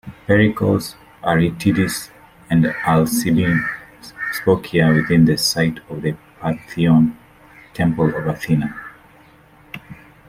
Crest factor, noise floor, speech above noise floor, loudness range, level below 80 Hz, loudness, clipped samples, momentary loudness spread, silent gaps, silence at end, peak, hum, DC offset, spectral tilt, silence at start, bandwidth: 18 dB; -48 dBFS; 32 dB; 3 LU; -46 dBFS; -18 LUFS; under 0.1%; 18 LU; none; 0.35 s; -2 dBFS; none; under 0.1%; -6 dB/octave; 0.05 s; 16 kHz